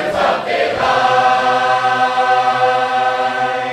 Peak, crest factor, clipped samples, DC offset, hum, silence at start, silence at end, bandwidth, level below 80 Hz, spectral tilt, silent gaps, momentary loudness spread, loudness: -2 dBFS; 14 dB; under 0.1%; under 0.1%; none; 0 s; 0 s; 12 kHz; -52 dBFS; -3.5 dB/octave; none; 4 LU; -14 LUFS